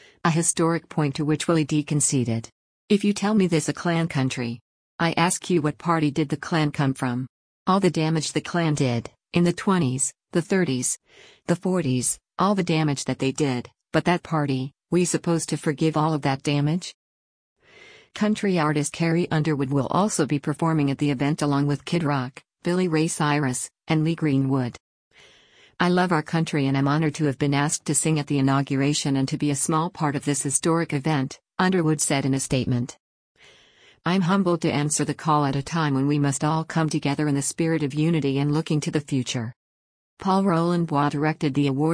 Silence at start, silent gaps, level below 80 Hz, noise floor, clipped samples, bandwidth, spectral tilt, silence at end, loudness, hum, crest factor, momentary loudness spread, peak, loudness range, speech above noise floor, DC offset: 0.25 s; 2.52-2.88 s, 4.61-4.99 s, 7.29-7.66 s, 16.94-17.56 s, 24.80-25.11 s, 33.00-33.35 s, 39.56-40.17 s; -58 dBFS; -55 dBFS; under 0.1%; 10.5 kHz; -5 dB/octave; 0 s; -23 LUFS; none; 16 dB; 5 LU; -6 dBFS; 2 LU; 33 dB; under 0.1%